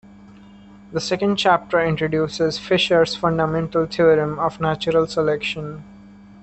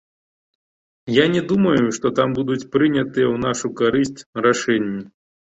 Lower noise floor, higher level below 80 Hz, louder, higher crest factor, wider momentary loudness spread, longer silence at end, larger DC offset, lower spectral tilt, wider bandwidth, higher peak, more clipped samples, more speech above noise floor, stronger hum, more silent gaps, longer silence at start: second, -44 dBFS vs under -90 dBFS; about the same, -50 dBFS vs -54 dBFS; about the same, -20 LUFS vs -19 LUFS; about the same, 18 dB vs 18 dB; first, 9 LU vs 6 LU; second, 0.35 s vs 0.55 s; neither; about the same, -5.5 dB/octave vs -5.5 dB/octave; about the same, 8.6 kHz vs 8.2 kHz; about the same, -4 dBFS vs -2 dBFS; neither; second, 25 dB vs over 71 dB; neither; second, none vs 4.26-4.33 s; second, 0.7 s vs 1.05 s